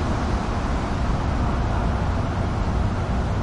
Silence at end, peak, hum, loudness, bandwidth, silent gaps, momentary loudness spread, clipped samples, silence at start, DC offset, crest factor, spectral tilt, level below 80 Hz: 0 s; -10 dBFS; none; -24 LUFS; 11 kHz; none; 1 LU; under 0.1%; 0 s; under 0.1%; 12 dB; -7 dB/octave; -26 dBFS